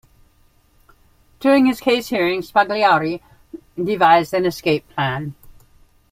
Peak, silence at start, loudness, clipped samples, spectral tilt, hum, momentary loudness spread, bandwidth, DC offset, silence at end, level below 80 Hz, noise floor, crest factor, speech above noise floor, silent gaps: -2 dBFS; 1.4 s; -18 LUFS; under 0.1%; -5.5 dB/octave; none; 13 LU; 16 kHz; under 0.1%; 0.8 s; -54 dBFS; -56 dBFS; 18 dB; 39 dB; none